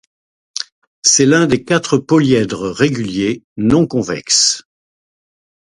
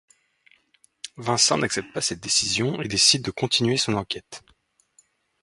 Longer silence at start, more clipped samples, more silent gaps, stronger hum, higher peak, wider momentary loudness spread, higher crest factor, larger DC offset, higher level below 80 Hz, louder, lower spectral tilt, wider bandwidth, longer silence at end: second, 0.55 s vs 1.05 s; neither; first, 0.72-1.02 s, 3.44-3.56 s vs none; neither; first, 0 dBFS vs -4 dBFS; second, 14 LU vs 18 LU; second, 16 dB vs 22 dB; neither; first, -46 dBFS vs -56 dBFS; first, -14 LUFS vs -22 LUFS; about the same, -3.5 dB/octave vs -2.5 dB/octave; about the same, 11.5 kHz vs 11.5 kHz; about the same, 1.15 s vs 1.05 s